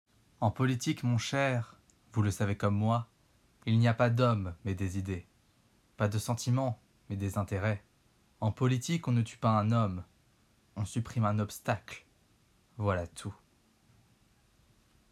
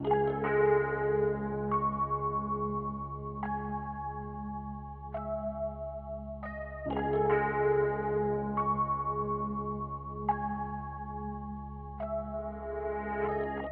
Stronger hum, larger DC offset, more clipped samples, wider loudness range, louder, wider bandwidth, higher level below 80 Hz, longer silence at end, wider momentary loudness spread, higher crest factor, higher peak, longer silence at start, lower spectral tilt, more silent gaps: neither; neither; neither; about the same, 6 LU vs 7 LU; about the same, -32 LUFS vs -33 LUFS; first, 13.5 kHz vs 4 kHz; second, -62 dBFS vs -48 dBFS; first, 1.8 s vs 0 s; about the same, 14 LU vs 12 LU; about the same, 20 dB vs 18 dB; about the same, -14 dBFS vs -16 dBFS; first, 0.4 s vs 0 s; about the same, -6.5 dB/octave vs -7 dB/octave; neither